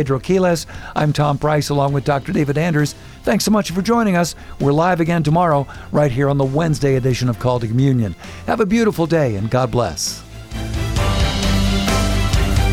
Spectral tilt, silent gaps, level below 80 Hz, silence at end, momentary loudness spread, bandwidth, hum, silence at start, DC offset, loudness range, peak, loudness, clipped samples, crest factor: -6 dB/octave; none; -28 dBFS; 0 s; 7 LU; 16.5 kHz; none; 0 s; under 0.1%; 2 LU; -4 dBFS; -18 LUFS; under 0.1%; 14 dB